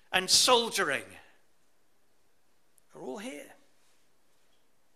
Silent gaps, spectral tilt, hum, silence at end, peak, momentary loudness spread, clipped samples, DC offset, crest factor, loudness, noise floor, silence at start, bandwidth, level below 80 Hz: none; -0.5 dB/octave; none; 1.55 s; -8 dBFS; 23 LU; under 0.1%; under 0.1%; 24 dB; -24 LUFS; -73 dBFS; 0.1 s; 15.5 kHz; -70 dBFS